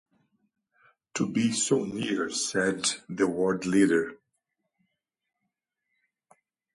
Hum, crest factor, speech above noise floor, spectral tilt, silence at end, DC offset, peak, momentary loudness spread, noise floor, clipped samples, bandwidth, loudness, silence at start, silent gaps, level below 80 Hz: none; 20 dB; 56 dB; -4 dB/octave; 2.6 s; under 0.1%; -10 dBFS; 7 LU; -83 dBFS; under 0.1%; 11.5 kHz; -27 LUFS; 1.15 s; none; -68 dBFS